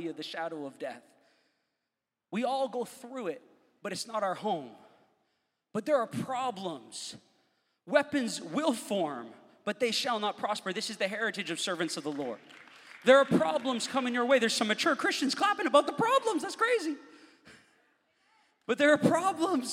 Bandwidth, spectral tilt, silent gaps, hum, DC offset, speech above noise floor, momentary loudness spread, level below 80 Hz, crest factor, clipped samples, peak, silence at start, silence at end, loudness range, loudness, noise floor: 16 kHz; -3.5 dB/octave; none; none; under 0.1%; 58 dB; 15 LU; -82 dBFS; 22 dB; under 0.1%; -8 dBFS; 0 s; 0 s; 9 LU; -30 LUFS; -87 dBFS